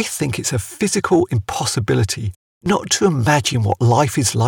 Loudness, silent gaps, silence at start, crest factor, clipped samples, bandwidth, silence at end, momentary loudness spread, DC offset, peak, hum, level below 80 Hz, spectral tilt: -18 LUFS; 2.36-2.61 s; 0 s; 16 dB; under 0.1%; 18 kHz; 0 s; 6 LU; under 0.1%; -2 dBFS; none; -44 dBFS; -4.5 dB/octave